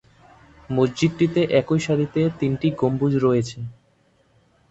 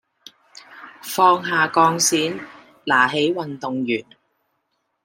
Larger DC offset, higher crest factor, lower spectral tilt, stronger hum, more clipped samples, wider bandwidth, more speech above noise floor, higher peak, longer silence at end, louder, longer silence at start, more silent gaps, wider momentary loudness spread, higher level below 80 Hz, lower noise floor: neither; about the same, 18 dB vs 20 dB; first, -7 dB/octave vs -2.5 dB/octave; neither; neither; second, 8.2 kHz vs 16.5 kHz; second, 41 dB vs 53 dB; about the same, -4 dBFS vs -2 dBFS; about the same, 1 s vs 1.05 s; about the same, -21 LUFS vs -19 LUFS; about the same, 0.7 s vs 0.7 s; neither; second, 7 LU vs 18 LU; first, -52 dBFS vs -72 dBFS; second, -61 dBFS vs -72 dBFS